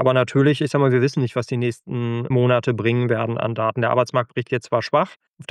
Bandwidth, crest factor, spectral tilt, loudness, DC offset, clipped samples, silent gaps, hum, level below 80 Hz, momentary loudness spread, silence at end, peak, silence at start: 10 kHz; 16 dB; -7 dB/octave; -20 LUFS; under 0.1%; under 0.1%; 5.16-5.20 s, 5.28-5.34 s; none; -64 dBFS; 7 LU; 0.05 s; -4 dBFS; 0 s